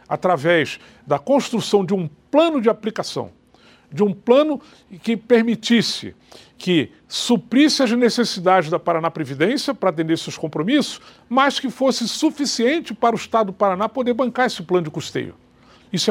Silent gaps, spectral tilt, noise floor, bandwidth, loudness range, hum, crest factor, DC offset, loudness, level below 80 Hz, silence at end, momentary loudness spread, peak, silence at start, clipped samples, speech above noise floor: none; -4.5 dB/octave; -52 dBFS; 16 kHz; 2 LU; none; 18 dB; under 0.1%; -19 LUFS; -64 dBFS; 0 s; 11 LU; 0 dBFS; 0.1 s; under 0.1%; 32 dB